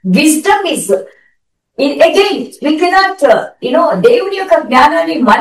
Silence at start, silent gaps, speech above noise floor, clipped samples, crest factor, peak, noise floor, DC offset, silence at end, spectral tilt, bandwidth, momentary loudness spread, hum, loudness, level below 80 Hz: 0.05 s; none; 51 dB; 0.9%; 10 dB; 0 dBFS; -61 dBFS; 0.1%; 0 s; -4 dB/octave; 16 kHz; 7 LU; none; -10 LUFS; -48 dBFS